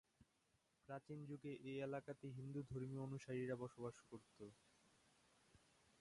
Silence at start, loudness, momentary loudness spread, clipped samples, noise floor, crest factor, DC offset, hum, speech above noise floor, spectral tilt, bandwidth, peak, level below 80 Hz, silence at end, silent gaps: 0.2 s; -52 LUFS; 13 LU; under 0.1%; -83 dBFS; 18 dB; under 0.1%; none; 32 dB; -7.5 dB/octave; 11 kHz; -34 dBFS; -80 dBFS; 0.45 s; none